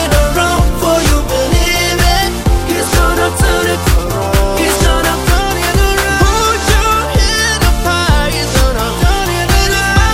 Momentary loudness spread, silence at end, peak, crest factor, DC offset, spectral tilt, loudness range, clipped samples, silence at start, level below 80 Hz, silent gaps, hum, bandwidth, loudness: 3 LU; 0 s; 0 dBFS; 10 dB; 0.2%; -4 dB/octave; 1 LU; under 0.1%; 0 s; -16 dBFS; none; none; 16.5 kHz; -12 LUFS